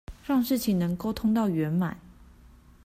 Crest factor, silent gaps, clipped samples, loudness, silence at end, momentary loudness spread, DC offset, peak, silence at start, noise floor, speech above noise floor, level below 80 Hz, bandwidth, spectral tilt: 14 dB; none; under 0.1%; -27 LUFS; 0.6 s; 5 LU; under 0.1%; -14 dBFS; 0.1 s; -53 dBFS; 28 dB; -50 dBFS; 16 kHz; -6.5 dB/octave